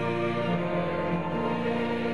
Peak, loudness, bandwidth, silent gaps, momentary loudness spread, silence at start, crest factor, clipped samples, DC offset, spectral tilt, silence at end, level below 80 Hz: -16 dBFS; -28 LUFS; 10.5 kHz; none; 1 LU; 0 s; 12 dB; under 0.1%; 0.7%; -8 dB/octave; 0 s; -60 dBFS